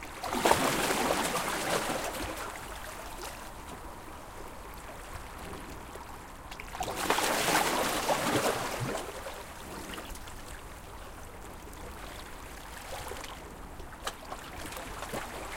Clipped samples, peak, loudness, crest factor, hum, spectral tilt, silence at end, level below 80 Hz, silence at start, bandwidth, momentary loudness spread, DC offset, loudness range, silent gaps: under 0.1%; -8 dBFS; -33 LUFS; 26 dB; none; -3 dB/octave; 0 s; -50 dBFS; 0 s; 17 kHz; 18 LU; under 0.1%; 14 LU; none